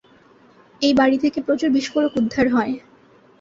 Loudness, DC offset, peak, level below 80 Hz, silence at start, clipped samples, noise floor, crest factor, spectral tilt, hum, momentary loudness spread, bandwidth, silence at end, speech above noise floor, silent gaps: -19 LUFS; under 0.1%; -6 dBFS; -54 dBFS; 0.8 s; under 0.1%; -52 dBFS; 16 dB; -5 dB/octave; none; 6 LU; 7.8 kHz; 0.6 s; 33 dB; none